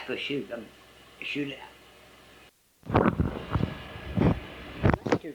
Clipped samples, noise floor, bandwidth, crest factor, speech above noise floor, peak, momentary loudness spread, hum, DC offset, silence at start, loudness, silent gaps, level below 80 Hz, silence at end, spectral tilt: under 0.1%; -57 dBFS; 19.5 kHz; 24 dB; 28 dB; -6 dBFS; 16 LU; none; under 0.1%; 0 s; -29 LUFS; none; -42 dBFS; 0 s; -7.5 dB/octave